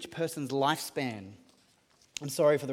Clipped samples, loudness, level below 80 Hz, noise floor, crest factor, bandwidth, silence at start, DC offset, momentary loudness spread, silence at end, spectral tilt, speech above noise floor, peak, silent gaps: under 0.1%; -31 LUFS; -76 dBFS; -66 dBFS; 18 dB; 17 kHz; 0 s; under 0.1%; 17 LU; 0 s; -4.5 dB/octave; 35 dB; -14 dBFS; none